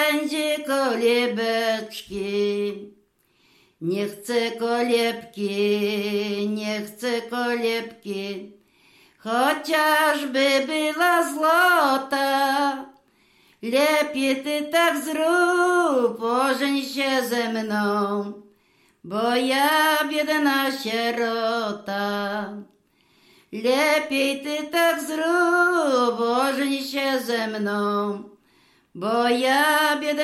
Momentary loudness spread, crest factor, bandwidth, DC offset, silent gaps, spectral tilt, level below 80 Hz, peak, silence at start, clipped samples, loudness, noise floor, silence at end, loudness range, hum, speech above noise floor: 10 LU; 14 dB; 15.5 kHz; under 0.1%; none; -3.5 dB/octave; -70 dBFS; -8 dBFS; 0 s; under 0.1%; -22 LUFS; -63 dBFS; 0 s; 5 LU; none; 41 dB